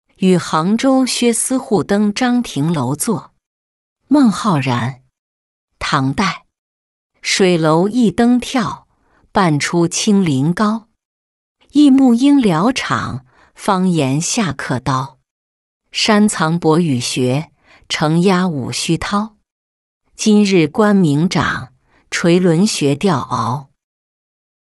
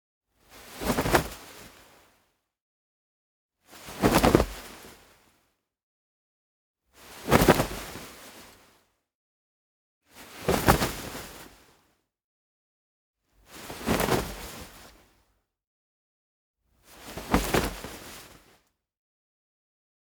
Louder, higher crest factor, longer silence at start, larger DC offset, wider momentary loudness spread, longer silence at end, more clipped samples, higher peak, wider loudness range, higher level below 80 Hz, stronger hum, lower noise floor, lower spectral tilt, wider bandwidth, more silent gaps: first, -15 LUFS vs -26 LUFS; second, 14 dB vs 30 dB; second, 0.2 s vs 0.55 s; neither; second, 10 LU vs 25 LU; second, 1.1 s vs 1.85 s; neither; about the same, -2 dBFS vs -2 dBFS; about the same, 4 LU vs 5 LU; about the same, -48 dBFS vs -44 dBFS; neither; second, -56 dBFS vs -73 dBFS; about the same, -5 dB/octave vs -4.5 dB/octave; second, 12 kHz vs over 20 kHz; second, 3.46-3.96 s, 5.19-5.68 s, 6.58-7.10 s, 11.05-11.55 s, 15.31-15.80 s, 19.52-20.01 s vs 2.61-3.49 s, 5.83-6.74 s, 9.15-10.01 s, 12.24-13.14 s, 15.67-16.54 s